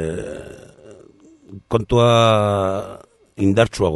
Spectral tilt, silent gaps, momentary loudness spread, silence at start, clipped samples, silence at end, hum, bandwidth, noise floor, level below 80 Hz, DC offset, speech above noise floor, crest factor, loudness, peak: -6 dB/octave; none; 20 LU; 0 s; under 0.1%; 0 s; none; 11.5 kHz; -48 dBFS; -42 dBFS; under 0.1%; 31 dB; 18 dB; -17 LUFS; -2 dBFS